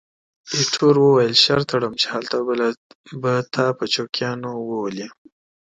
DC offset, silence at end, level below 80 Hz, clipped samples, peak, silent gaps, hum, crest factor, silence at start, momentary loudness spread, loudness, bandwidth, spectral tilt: under 0.1%; 0.65 s; -60 dBFS; under 0.1%; -2 dBFS; 2.77-3.04 s; none; 18 dB; 0.45 s; 14 LU; -19 LUFS; 9.2 kHz; -4 dB/octave